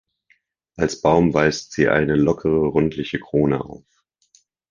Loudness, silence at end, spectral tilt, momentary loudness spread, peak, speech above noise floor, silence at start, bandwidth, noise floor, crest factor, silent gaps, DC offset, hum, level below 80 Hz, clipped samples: -19 LUFS; 0.95 s; -6.5 dB/octave; 8 LU; -2 dBFS; 44 dB; 0.8 s; 9.6 kHz; -63 dBFS; 18 dB; none; under 0.1%; none; -44 dBFS; under 0.1%